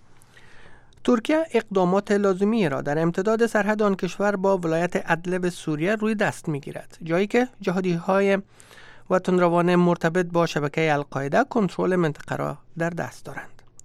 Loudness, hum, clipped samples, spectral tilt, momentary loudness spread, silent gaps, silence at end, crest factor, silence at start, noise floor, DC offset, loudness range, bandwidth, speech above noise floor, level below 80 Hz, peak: -23 LUFS; none; under 0.1%; -6.5 dB/octave; 9 LU; none; 0 s; 18 dB; 0.1 s; -48 dBFS; under 0.1%; 3 LU; 13.5 kHz; 25 dB; -54 dBFS; -6 dBFS